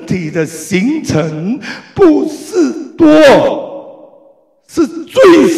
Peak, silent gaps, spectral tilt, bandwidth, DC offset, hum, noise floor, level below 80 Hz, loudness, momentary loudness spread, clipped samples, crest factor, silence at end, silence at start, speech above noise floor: 0 dBFS; none; -5.5 dB/octave; 14.5 kHz; under 0.1%; none; -47 dBFS; -44 dBFS; -11 LUFS; 16 LU; under 0.1%; 10 dB; 0 s; 0 s; 38 dB